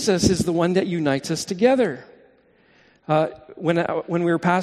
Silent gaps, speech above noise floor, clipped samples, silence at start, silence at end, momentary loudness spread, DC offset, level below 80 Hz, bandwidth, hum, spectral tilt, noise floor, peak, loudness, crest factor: none; 36 dB; under 0.1%; 0 s; 0 s; 8 LU; under 0.1%; -48 dBFS; 13 kHz; none; -5.5 dB/octave; -57 dBFS; -4 dBFS; -21 LUFS; 18 dB